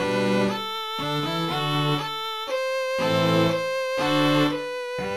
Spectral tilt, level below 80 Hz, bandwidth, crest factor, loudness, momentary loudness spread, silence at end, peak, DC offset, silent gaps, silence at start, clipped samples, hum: -5.5 dB/octave; -58 dBFS; 15.5 kHz; 16 dB; -24 LUFS; 8 LU; 0 s; -8 dBFS; 0.3%; none; 0 s; under 0.1%; none